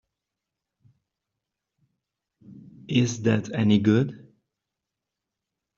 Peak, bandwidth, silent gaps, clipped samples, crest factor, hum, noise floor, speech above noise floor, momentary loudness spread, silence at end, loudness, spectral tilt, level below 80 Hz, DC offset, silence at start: -6 dBFS; 7.4 kHz; none; under 0.1%; 22 dB; none; -86 dBFS; 64 dB; 6 LU; 1.6 s; -23 LUFS; -6.5 dB/octave; -64 dBFS; under 0.1%; 2.5 s